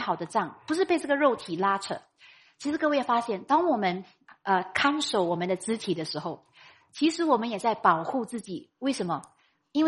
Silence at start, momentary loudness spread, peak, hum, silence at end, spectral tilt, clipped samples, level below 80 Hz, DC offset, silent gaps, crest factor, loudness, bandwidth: 0 s; 12 LU; -8 dBFS; none; 0 s; -4.5 dB/octave; under 0.1%; -72 dBFS; under 0.1%; none; 20 dB; -27 LUFS; 11.5 kHz